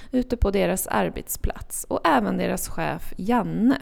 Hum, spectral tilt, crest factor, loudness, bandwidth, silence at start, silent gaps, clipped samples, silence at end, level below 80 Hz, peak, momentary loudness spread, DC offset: none; -5 dB/octave; 18 dB; -24 LUFS; 19.5 kHz; 0 s; none; under 0.1%; 0 s; -34 dBFS; -6 dBFS; 9 LU; under 0.1%